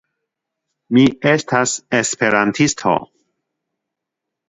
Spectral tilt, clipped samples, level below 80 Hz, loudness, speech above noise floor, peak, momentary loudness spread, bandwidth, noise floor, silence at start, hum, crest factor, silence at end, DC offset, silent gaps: -4 dB/octave; under 0.1%; -54 dBFS; -16 LUFS; 66 dB; 0 dBFS; 5 LU; 8 kHz; -81 dBFS; 0.9 s; none; 18 dB; 1.45 s; under 0.1%; none